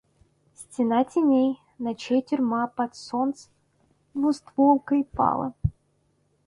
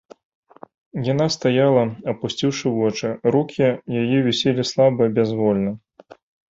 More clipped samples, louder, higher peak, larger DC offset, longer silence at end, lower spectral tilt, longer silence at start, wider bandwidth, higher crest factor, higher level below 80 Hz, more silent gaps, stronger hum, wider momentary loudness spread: neither; second, -25 LUFS vs -20 LUFS; second, -8 dBFS vs -4 dBFS; neither; about the same, 0.75 s vs 0.7 s; about the same, -7 dB/octave vs -6 dB/octave; second, 0.6 s vs 0.95 s; first, 11 kHz vs 7.8 kHz; about the same, 18 dB vs 16 dB; first, -48 dBFS vs -58 dBFS; neither; neither; first, 11 LU vs 8 LU